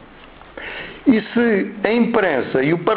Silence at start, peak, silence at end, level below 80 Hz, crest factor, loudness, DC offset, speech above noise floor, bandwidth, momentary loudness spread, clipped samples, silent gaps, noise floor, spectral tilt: 0 s; 0 dBFS; 0 s; -50 dBFS; 18 dB; -18 LUFS; under 0.1%; 25 dB; 4.7 kHz; 14 LU; under 0.1%; none; -42 dBFS; -11 dB/octave